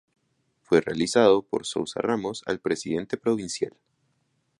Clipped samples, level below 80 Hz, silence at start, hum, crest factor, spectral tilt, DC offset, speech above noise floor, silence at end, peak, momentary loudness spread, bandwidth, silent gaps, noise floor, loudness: under 0.1%; -62 dBFS; 0.7 s; none; 22 dB; -4.5 dB/octave; under 0.1%; 47 dB; 0.9 s; -4 dBFS; 10 LU; 11.5 kHz; none; -72 dBFS; -25 LUFS